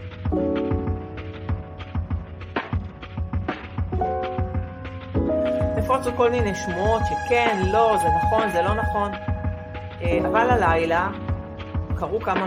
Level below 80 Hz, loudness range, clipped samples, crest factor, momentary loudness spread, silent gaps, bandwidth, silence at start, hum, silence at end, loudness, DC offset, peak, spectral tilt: -34 dBFS; 8 LU; under 0.1%; 18 dB; 12 LU; none; 14.5 kHz; 0 s; none; 0 s; -24 LUFS; under 0.1%; -6 dBFS; -6.5 dB/octave